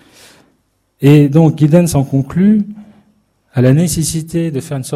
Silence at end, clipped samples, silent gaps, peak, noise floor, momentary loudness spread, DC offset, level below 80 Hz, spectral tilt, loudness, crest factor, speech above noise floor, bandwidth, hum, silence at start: 0 s; 0.3%; none; 0 dBFS; -60 dBFS; 10 LU; under 0.1%; -42 dBFS; -7 dB/octave; -12 LUFS; 12 dB; 49 dB; 14 kHz; none; 1 s